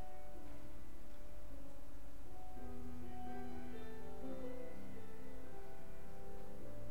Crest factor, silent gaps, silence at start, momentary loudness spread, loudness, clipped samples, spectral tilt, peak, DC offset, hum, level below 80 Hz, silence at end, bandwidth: 14 dB; none; 0 s; 8 LU; -54 LUFS; under 0.1%; -6.5 dB/octave; -30 dBFS; 1%; none; -58 dBFS; 0 s; 16.5 kHz